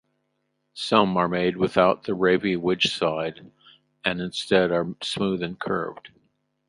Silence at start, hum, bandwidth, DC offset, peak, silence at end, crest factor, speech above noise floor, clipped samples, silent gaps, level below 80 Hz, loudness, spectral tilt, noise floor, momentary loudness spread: 0.75 s; none; 11.5 kHz; under 0.1%; -2 dBFS; 0.6 s; 22 dB; 51 dB; under 0.1%; none; -58 dBFS; -24 LUFS; -5.5 dB/octave; -74 dBFS; 9 LU